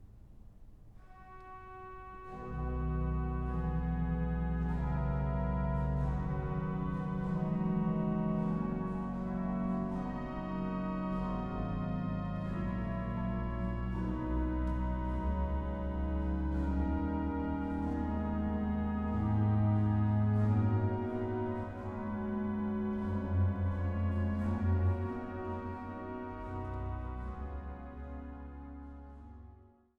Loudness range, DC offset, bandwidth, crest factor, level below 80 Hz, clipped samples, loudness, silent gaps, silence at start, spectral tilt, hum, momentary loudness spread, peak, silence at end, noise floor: 8 LU; under 0.1%; 5 kHz; 14 dB; -42 dBFS; under 0.1%; -35 LUFS; none; 0 s; -10.5 dB/octave; none; 14 LU; -20 dBFS; 0.35 s; -59 dBFS